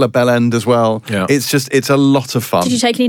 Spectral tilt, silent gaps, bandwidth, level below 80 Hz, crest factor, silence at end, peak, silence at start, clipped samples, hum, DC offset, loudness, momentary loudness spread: -5 dB/octave; none; 19.5 kHz; -58 dBFS; 12 dB; 0 s; -2 dBFS; 0 s; under 0.1%; none; under 0.1%; -14 LUFS; 4 LU